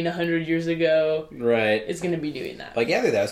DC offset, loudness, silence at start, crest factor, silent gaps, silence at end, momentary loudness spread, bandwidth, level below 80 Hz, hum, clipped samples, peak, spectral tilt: under 0.1%; -24 LUFS; 0 s; 14 dB; none; 0 s; 8 LU; 15 kHz; -58 dBFS; none; under 0.1%; -8 dBFS; -5.5 dB/octave